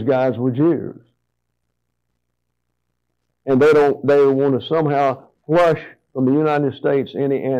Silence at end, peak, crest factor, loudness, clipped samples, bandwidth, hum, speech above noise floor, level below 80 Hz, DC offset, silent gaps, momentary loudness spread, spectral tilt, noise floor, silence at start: 0 s; -8 dBFS; 10 dB; -17 LUFS; under 0.1%; 8.4 kHz; 60 Hz at -55 dBFS; 59 dB; -60 dBFS; under 0.1%; none; 11 LU; -8 dB/octave; -75 dBFS; 0 s